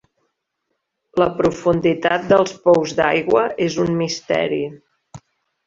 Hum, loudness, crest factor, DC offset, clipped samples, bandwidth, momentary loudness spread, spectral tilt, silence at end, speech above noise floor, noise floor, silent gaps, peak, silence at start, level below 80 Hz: none; -18 LUFS; 18 dB; under 0.1%; under 0.1%; 7.6 kHz; 6 LU; -5.5 dB/octave; 0.5 s; 57 dB; -75 dBFS; none; -2 dBFS; 1.15 s; -52 dBFS